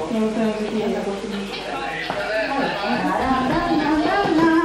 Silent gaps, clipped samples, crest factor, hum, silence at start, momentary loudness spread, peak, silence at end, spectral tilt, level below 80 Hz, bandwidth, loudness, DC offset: none; under 0.1%; 16 dB; none; 0 s; 8 LU; -6 dBFS; 0 s; -5.5 dB/octave; -44 dBFS; 13 kHz; -21 LUFS; under 0.1%